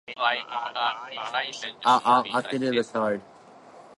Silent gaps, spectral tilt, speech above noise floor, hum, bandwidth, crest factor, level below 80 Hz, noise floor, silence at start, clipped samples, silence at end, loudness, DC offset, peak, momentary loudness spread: none; -4 dB/octave; 24 dB; none; 11.5 kHz; 20 dB; -74 dBFS; -49 dBFS; 0.1 s; under 0.1%; 0.05 s; -26 LUFS; under 0.1%; -6 dBFS; 10 LU